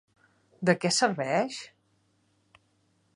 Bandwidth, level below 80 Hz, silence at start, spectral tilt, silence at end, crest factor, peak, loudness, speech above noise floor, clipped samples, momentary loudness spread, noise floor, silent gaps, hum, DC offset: 11.5 kHz; -76 dBFS; 0.6 s; -4 dB/octave; 1.5 s; 24 dB; -6 dBFS; -27 LUFS; 43 dB; under 0.1%; 15 LU; -70 dBFS; none; none; under 0.1%